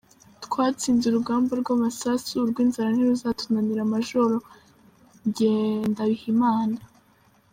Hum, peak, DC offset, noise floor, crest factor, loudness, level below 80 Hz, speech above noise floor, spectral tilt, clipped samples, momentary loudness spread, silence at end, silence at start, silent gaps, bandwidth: none; -10 dBFS; under 0.1%; -60 dBFS; 14 dB; -24 LUFS; -62 dBFS; 37 dB; -5.5 dB/octave; under 0.1%; 7 LU; 0.7 s; 0.4 s; none; 16 kHz